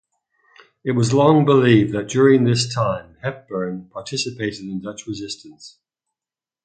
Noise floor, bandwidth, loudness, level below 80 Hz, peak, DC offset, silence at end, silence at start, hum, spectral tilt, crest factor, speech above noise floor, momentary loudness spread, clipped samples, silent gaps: under -90 dBFS; 9.2 kHz; -19 LUFS; -56 dBFS; 0 dBFS; under 0.1%; 0.95 s; 0.85 s; none; -6 dB/octave; 20 dB; over 71 dB; 16 LU; under 0.1%; none